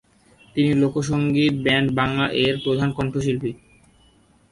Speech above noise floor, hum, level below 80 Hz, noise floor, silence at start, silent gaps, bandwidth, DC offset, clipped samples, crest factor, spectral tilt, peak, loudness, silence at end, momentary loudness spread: 36 dB; none; -48 dBFS; -56 dBFS; 0.55 s; none; 11.5 kHz; under 0.1%; under 0.1%; 16 dB; -6 dB/octave; -6 dBFS; -21 LUFS; 0.95 s; 5 LU